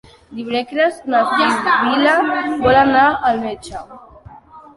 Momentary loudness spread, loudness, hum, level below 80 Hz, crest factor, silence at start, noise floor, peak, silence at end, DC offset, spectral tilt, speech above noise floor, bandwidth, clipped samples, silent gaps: 17 LU; -15 LUFS; none; -46 dBFS; 16 dB; 0.3 s; -41 dBFS; -2 dBFS; 0.15 s; under 0.1%; -5 dB/octave; 25 dB; 11.5 kHz; under 0.1%; none